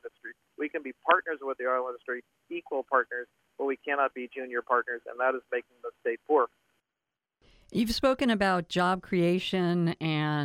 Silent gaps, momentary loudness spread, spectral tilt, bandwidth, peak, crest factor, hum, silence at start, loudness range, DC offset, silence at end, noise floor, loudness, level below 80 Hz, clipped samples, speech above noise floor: none; 13 LU; -6 dB/octave; 16 kHz; -8 dBFS; 22 dB; none; 0.05 s; 4 LU; under 0.1%; 0 s; -89 dBFS; -29 LUFS; -58 dBFS; under 0.1%; 60 dB